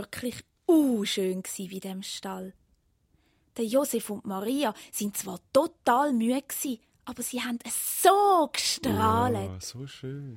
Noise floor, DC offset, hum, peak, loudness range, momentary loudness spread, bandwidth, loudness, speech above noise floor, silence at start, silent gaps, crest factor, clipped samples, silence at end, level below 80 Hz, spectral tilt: -69 dBFS; under 0.1%; none; -6 dBFS; 6 LU; 15 LU; 16.5 kHz; -27 LUFS; 41 dB; 0 s; none; 22 dB; under 0.1%; 0 s; -64 dBFS; -4 dB/octave